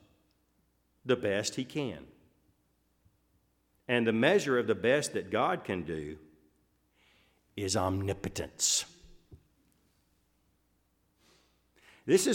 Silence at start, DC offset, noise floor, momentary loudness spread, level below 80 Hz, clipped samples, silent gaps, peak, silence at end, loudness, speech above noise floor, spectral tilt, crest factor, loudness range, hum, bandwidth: 1.05 s; under 0.1%; -73 dBFS; 19 LU; -64 dBFS; under 0.1%; none; -12 dBFS; 0 s; -30 LUFS; 43 dB; -3.5 dB/octave; 22 dB; 7 LU; none; 17 kHz